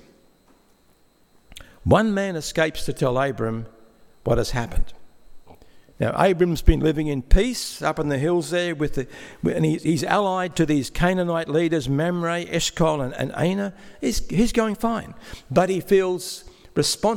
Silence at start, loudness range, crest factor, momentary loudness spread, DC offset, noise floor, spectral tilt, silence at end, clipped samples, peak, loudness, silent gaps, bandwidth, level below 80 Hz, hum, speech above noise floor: 1.5 s; 3 LU; 22 dB; 10 LU; under 0.1%; -58 dBFS; -5.5 dB/octave; 0 s; under 0.1%; 0 dBFS; -23 LUFS; none; 17 kHz; -30 dBFS; none; 37 dB